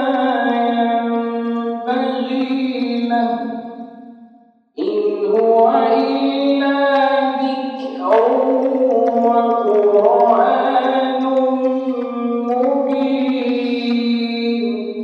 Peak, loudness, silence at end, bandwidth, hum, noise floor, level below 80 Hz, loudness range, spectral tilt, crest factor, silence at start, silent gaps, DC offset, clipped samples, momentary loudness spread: -2 dBFS; -17 LUFS; 0 s; 6 kHz; none; -50 dBFS; -80 dBFS; 6 LU; -6.5 dB/octave; 16 dB; 0 s; none; under 0.1%; under 0.1%; 9 LU